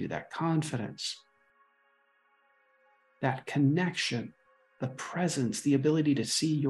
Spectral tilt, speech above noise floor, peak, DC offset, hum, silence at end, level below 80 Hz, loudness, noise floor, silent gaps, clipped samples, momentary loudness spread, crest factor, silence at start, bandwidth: -5 dB/octave; 40 dB; -14 dBFS; under 0.1%; none; 0 s; -72 dBFS; -30 LUFS; -69 dBFS; none; under 0.1%; 11 LU; 18 dB; 0 s; 12.5 kHz